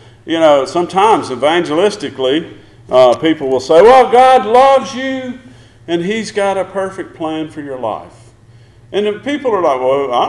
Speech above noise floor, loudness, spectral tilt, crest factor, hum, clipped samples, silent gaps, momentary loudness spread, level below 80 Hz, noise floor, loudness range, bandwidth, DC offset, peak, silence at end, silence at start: 30 dB; -12 LUFS; -5 dB/octave; 12 dB; none; under 0.1%; none; 15 LU; -48 dBFS; -42 dBFS; 10 LU; 11.5 kHz; under 0.1%; 0 dBFS; 0 s; 0.25 s